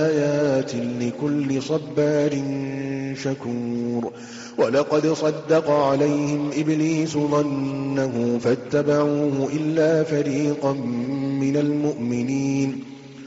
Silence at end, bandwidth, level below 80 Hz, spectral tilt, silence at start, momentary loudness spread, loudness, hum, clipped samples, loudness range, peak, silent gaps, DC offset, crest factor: 0 s; 8 kHz; -62 dBFS; -6.5 dB/octave; 0 s; 8 LU; -22 LUFS; none; under 0.1%; 3 LU; -8 dBFS; none; under 0.1%; 14 dB